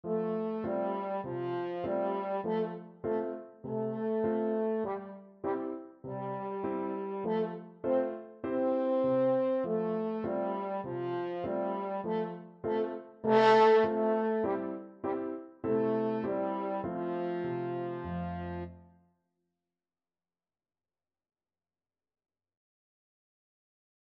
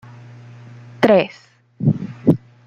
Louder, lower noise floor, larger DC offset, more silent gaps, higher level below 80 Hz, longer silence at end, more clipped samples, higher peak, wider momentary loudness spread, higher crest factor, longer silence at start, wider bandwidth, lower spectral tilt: second, -33 LUFS vs -18 LUFS; first, under -90 dBFS vs -40 dBFS; neither; neither; second, -68 dBFS vs -54 dBFS; first, 5.3 s vs 0.3 s; neither; second, -14 dBFS vs -2 dBFS; first, 11 LU vs 7 LU; about the same, 20 dB vs 18 dB; second, 0.05 s vs 1 s; second, 7.2 kHz vs 9.4 kHz; second, -5.5 dB/octave vs -8.5 dB/octave